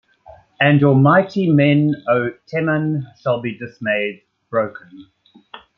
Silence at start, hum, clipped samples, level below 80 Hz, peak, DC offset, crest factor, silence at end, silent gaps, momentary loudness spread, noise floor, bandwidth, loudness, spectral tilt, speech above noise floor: 0.6 s; none; under 0.1%; -60 dBFS; -2 dBFS; under 0.1%; 16 dB; 0.2 s; none; 11 LU; -46 dBFS; 5.8 kHz; -17 LUFS; -9 dB/octave; 29 dB